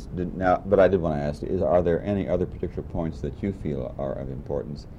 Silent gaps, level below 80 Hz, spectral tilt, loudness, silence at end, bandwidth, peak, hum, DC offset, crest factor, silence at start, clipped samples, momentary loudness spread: none; -40 dBFS; -9 dB/octave; -26 LUFS; 0 s; 9.8 kHz; -8 dBFS; none; under 0.1%; 18 dB; 0 s; under 0.1%; 12 LU